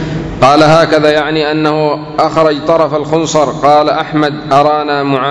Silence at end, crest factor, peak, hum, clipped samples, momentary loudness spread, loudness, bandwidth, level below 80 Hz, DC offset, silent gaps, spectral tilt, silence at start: 0 s; 10 dB; 0 dBFS; none; 2%; 6 LU; -10 LUFS; 11 kHz; -38 dBFS; under 0.1%; none; -5.5 dB/octave; 0 s